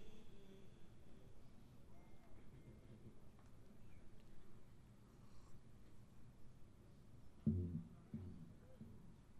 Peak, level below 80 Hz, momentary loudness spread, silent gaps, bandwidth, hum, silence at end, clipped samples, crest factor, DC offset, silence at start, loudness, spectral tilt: -28 dBFS; -68 dBFS; 19 LU; none; 13.5 kHz; none; 0 s; under 0.1%; 24 dB; under 0.1%; 0 s; -53 LUFS; -8.5 dB/octave